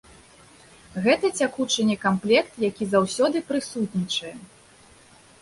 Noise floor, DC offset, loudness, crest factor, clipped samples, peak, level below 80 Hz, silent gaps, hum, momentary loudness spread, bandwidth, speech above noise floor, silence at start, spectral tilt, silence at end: -52 dBFS; under 0.1%; -23 LUFS; 18 dB; under 0.1%; -6 dBFS; -60 dBFS; none; none; 8 LU; 11.5 kHz; 29 dB; 0.95 s; -4.5 dB/octave; 0.95 s